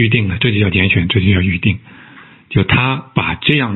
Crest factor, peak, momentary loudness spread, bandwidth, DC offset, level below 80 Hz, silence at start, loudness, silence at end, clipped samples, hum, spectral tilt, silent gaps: 14 dB; 0 dBFS; 5 LU; 4.2 kHz; under 0.1%; -38 dBFS; 0 s; -14 LUFS; 0 s; under 0.1%; none; -9.5 dB/octave; none